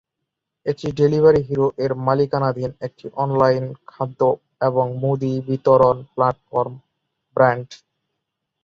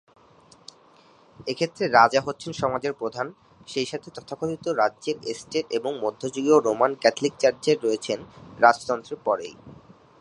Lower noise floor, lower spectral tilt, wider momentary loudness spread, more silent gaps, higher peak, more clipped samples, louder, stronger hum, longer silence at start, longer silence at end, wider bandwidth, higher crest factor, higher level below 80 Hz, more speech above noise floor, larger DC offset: first, -80 dBFS vs -55 dBFS; first, -8.5 dB/octave vs -4 dB/octave; about the same, 14 LU vs 13 LU; neither; about the same, -2 dBFS vs -2 dBFS; neither; first, -20 LUFS vs -24 LUFS; neither; second, 0.65 s vs 1.4 s; first, 0.9 s vs 0.45 s; second, 7.2 kHz vs 11 kHz; about the same, 18 dB vs 22 dB; first, -54 dBFS vs -64 dBFS; first, 62 dB vs 31 dB; neither